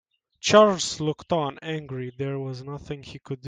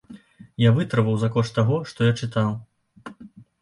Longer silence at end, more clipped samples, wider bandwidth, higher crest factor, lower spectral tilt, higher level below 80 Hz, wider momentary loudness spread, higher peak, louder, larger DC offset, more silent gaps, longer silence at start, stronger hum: second, 0 s vs 0.35 s; neither; second, 9.6 kHz vs 11 kHz; first, 22 dB vs 16 dB; second, -4.5 dB/octave vs -7.5 dB/octave; about the same, -60 dBFS vs -56 dBFS; second, 19 LU vs 22 LU; first, -2 dBFS vs -6 dBFS; about the same, -24 LUFS vs -22 LUFS; neither; neither; first, 0.45 s vs 0.1 s; neither